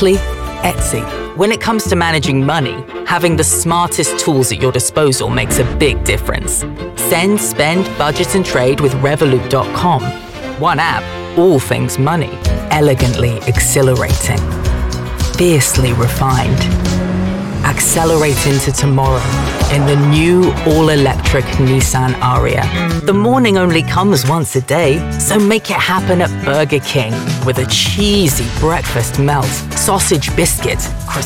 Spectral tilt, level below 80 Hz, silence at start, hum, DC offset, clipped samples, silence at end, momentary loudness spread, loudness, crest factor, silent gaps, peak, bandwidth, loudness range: -4.5 dB/octave; -24 dBFS; 0 s; none; 0.2%; under 0.1%; 0 s; 6 LU; -13 LUFS; 10 dB; none; -2 dBFS; 17 kHz; 2 LU